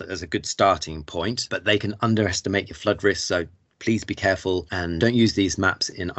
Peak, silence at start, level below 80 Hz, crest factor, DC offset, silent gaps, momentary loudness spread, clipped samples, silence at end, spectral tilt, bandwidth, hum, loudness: -6 dBFS; 0 s; -50 dBFS; 18 dB; under 0.1%; none; 8 LU; under 0.1%; 0.05 s; -4.5 dB/octave; 8.2 kHz; none; -23 LUFS